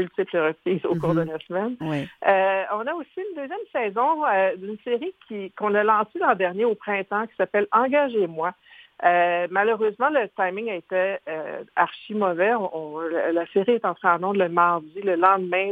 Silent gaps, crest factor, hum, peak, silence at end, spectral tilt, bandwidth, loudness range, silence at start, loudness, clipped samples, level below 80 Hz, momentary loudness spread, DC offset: none; 20 dB; none; -2 dBFS; 0 s; -8 dB/octave; 4.9 kHz; 3 LU; 0 s; -23 LUFS; under 0.1%; -68 dBFS; 10 LU; under 0.1%